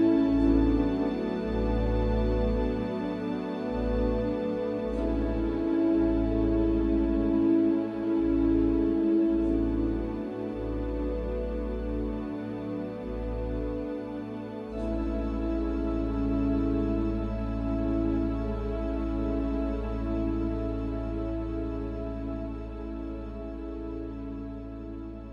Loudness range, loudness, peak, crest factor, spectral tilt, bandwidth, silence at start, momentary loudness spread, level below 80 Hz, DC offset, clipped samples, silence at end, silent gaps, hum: 8 LU; -29 LUFS; -12 dBFS; 16 dB; -9.5 dB/octave; 5.6 kHz; 0 s; 12 LU; -36 dBFS; under 0.1%; under 0.1%; 0 s; none; none